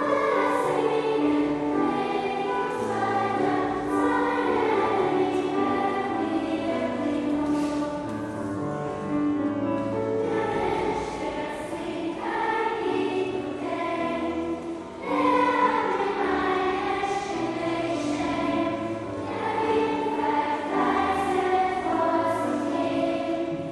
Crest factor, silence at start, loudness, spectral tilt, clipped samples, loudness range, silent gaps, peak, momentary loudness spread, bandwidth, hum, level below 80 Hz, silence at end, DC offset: 16 dB; 0 s; -26 LUFS; -6 dB/octave; under 0.1%; 3 LU; none; -10 dBFS; 7 LU; 12 kHz; none; -54 dBFS; 0 s; under 0.1%